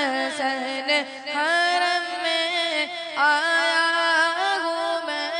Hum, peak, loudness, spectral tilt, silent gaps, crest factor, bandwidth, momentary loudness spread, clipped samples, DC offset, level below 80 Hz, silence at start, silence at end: none; -8 dBFS; -22 LUFS; 0 dB/octave; none; 14 dB; 10.5 kHz; 6 LU; under 0.1%; under 0.1%; -80 dBFS; 0 s; 0 s